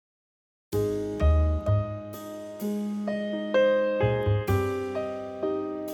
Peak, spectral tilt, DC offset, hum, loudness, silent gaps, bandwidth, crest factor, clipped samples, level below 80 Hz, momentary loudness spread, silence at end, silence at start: -12 dBFS; -7.5 dB/octave; under 0.1%; none; -27 LUFS; none; 17.5 kHz; 14 dB; under 0.1%; -34 dBFS; 11 LU; 0 s; 0.7 s